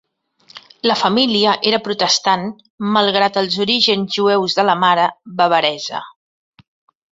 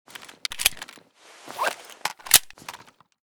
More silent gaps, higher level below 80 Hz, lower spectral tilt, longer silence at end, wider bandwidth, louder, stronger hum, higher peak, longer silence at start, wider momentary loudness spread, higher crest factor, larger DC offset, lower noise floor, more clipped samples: first, 2.70-2.78 s vs none; about the same, -62 dBFS vs -58 dBFS; first, -3.5 dB/octave vs 1.5 dB/octave; first, 1 s vs 0.55 s; second, 8 kHz vs over 20 kHz; first, -15 LUFS vs -23 LUFS; neither; about the same, 0 dBFS vs 0 dBFS; first, 0.55 s vs 0.2 s; second, 7 LU vs 23 LU; second, 16 dB vs 28 dB; neither; about the same, -52 dBFS vs -51 dBFS; neither